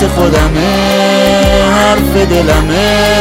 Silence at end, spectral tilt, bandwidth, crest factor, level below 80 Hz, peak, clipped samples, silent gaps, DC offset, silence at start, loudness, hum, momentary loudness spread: 0 s; -5 dB/octave; 16.5 kHz; 8 dB; -18 dBFS; 0 dBFS; under 0.1%; none; under 0.1%; 0 s; -9 LUFS; none; 2 LU